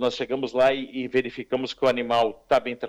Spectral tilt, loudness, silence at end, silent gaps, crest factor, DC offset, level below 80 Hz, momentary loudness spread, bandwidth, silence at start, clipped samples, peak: -5 dB/octave; -24 LUFS; 0 s; none; 14 dB; under 0.1%; -60 dBFS; 7 LU; 12 kHz; 0 s; under 0.1%; -10 dBFS